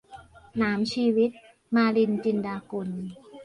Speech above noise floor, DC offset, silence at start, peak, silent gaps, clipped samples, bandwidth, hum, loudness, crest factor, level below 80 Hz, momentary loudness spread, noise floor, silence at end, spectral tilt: 24 dB; under 0.1%; 0.1 s; -12 dBFS; none; under 0.1%; 10.5 kHz; none; -26 LUFS; 14 dB; -62 dBFS; 12 LU; -49 dBFS; 0 s; -6.5 dB/octave